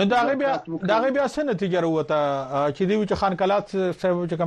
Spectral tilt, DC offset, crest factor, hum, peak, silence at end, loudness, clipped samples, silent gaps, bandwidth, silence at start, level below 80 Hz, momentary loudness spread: -6.5 dB/octave; under 0.1%; 14 dB; none; -8 dBFS; 0 s; -23 LUFS; under 0.1%; none; 10 kHz; 0 s; -54 dBFS; 4 LU